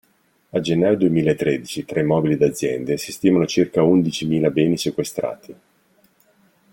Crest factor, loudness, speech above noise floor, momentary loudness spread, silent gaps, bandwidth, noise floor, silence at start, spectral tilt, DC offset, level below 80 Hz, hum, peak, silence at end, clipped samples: 16 dB; -20 LUFS; 42 dB; 9 LU; none; 17 kHz; -61 dBFS; 0.55 s; -6 dB/octave; under 0.1%; -56 dBFS; none; -4 dBFS; 1.2 s; under 0.1%